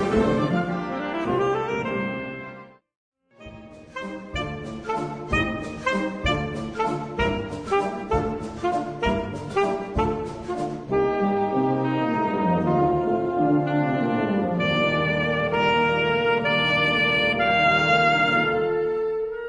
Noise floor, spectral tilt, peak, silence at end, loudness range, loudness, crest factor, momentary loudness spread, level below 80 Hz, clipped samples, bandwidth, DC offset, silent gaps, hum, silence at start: -44 dBFS; -6 dB/octave; -8 dBFS; 0 s; 10 LU; -23 LUFS; 14 dB; 11 LU; -42 dBFS; under 0.1%; 10.5 kHz; under 0.1%; 2.96-3.12 s; none; 0 s